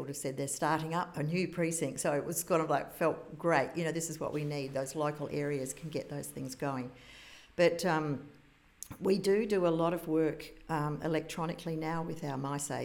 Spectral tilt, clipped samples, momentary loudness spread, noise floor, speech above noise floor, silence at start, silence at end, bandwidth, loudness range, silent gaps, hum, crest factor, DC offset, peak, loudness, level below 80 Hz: -5 dB/octave; under 0.1%; 11 LU; -54 dBFS; 20 dB; 0 s; 0 s; 18 kHz; 4 LU; none; none; 20 dB; under 0.1%; -14 dBFS; -34 LUFS; -64 dBFS